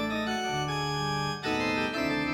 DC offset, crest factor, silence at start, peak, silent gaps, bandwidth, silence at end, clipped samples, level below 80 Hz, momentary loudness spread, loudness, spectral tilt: under 0.1%; 12 dB; 0 s; -18 dBFS; none; 17 kHz; 0 s; under 0.1%; -52 dBFS; 2 LU; -29 LUFS; -4.5 dB/octave